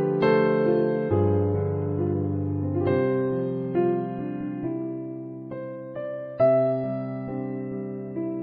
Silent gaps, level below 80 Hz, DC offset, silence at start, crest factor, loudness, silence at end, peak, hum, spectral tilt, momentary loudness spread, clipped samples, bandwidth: none; -60 dBFS; under 0.1%; 0 s; 16 dB; -26 LUFS; 0 s; -10 dBFS; none; -11 dB/octave; 13 LU; under 0.1%; 5.2 kHz